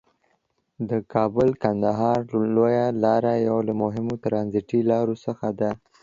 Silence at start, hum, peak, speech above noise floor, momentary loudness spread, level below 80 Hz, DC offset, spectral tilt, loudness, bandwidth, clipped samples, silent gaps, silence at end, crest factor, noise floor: 0.8 s; none; -6 dBFS; 48 dB; 7 LU; -56 dBFS; under 0.1%; -9 dB/octave; -23 LUFS; 7.4 kHz; under 0.1%; none; 0.25 s; 18 dB; -70 dBFS